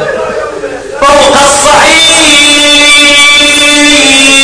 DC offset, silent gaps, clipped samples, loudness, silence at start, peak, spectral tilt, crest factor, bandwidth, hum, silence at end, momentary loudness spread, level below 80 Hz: under 0.1%; none; 10%; -1 LUFS; 0 s; 0 dBFS; -0.5 dB/octave; 4 dB; 11 kHz; none; 0 s; 14 LU; -30 dBFS